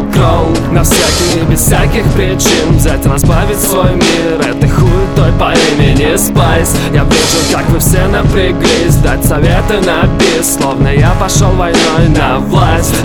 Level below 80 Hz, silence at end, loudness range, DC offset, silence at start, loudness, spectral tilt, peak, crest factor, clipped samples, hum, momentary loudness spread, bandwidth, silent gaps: -16 dBFS; 0 s; 1 LU; under 0.1%; 0 s; -9 LUFS; -5 dB/octave; 0 dBFS; 8 dB; under 0.1%; none; 2 LU; 19.5 kHz; none